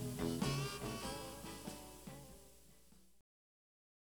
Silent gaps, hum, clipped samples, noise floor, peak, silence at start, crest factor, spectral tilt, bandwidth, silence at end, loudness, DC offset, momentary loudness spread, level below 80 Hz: none; none; under 0.1%; -68 dBFS; -26 dBFS; 0 s; 22 dB; -4.5 dB/octave; over 20 kHz; 1.1 s; -44 LUFS; under 0.1%; 22 LU; -60 dBFS